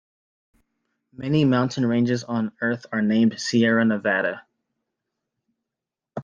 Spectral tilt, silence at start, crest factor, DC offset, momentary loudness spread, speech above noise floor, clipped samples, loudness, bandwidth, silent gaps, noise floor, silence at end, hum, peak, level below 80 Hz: -6 dB/octave; 1.2 s; 16 dB; under 0.1%; 8 LU; 65 dB; under 0.1%; -22 LUFS; 7.6 kHz; none; -87 dBFS; 0 s; none; -8 dBFS; -64 dBFS